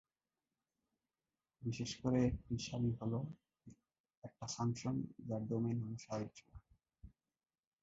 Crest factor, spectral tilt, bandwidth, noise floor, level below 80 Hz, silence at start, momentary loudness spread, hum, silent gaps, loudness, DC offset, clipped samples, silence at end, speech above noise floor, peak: 20 dB; -7.5 dB/octave; 7.6 kHz; under -90 dBFS; -62 dBFS; 1.6 s; 14 LU; none; 4.00-4.04 s, 4.17-4.22 s; -41 LUFS; under 0.1%; under 0.1%; 0.75 s; over 50 dB; -24 dBFS